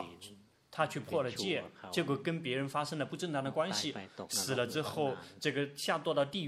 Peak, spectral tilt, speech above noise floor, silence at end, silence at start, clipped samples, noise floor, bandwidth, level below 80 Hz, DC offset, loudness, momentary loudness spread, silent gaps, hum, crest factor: -16 dBFS; -4 dB/octave; 21 dB; 0 s; 0 s; under 0.1%; -57 dBFS; 16 kHz; -76 dBFS; under 0.1%; -36 LUFS; 5 LU; none; none; 20 dB